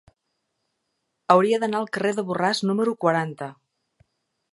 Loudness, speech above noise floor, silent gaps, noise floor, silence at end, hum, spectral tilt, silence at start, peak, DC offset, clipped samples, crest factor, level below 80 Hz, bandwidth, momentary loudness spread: -22 LUFS; 55 dB; none; -77 dBFS; 1 s; none; -5.5 dB/octave; 1.3 s; -2 dBFS; under 0.1%; under 0.1%; 22 dB; -72 dBFS; 11.5 kHz; 16 LU